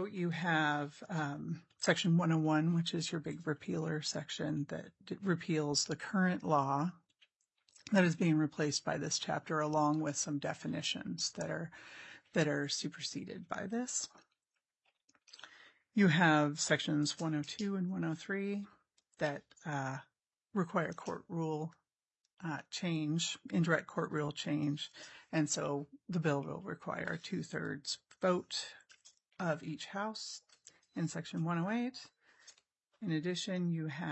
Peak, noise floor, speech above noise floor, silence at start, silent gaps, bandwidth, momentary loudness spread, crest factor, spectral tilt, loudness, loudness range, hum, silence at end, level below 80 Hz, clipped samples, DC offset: -14 dBFS; under -90 dBFS; over 54 dB; 0 s; none; 8.2 kHz; 12 LU; 22 dB; -4.5 dB/octave; -36 LUFS; 6 LU; none; 0 s; -80 dBFS; under 0.1%; under 0.1%